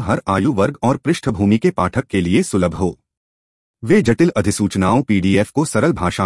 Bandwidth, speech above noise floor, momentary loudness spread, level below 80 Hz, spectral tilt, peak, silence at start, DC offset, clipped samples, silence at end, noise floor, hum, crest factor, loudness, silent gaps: 12 kHz; over 74 dB; 4 LU; -44 dBFS; -6 dB/octave; -2 dBFS; 0 s; under 0.1%; under 0.1%; 0 s; under -90 dBFS; none; 14 dB; -17 LUFS; 3.17-3.74 s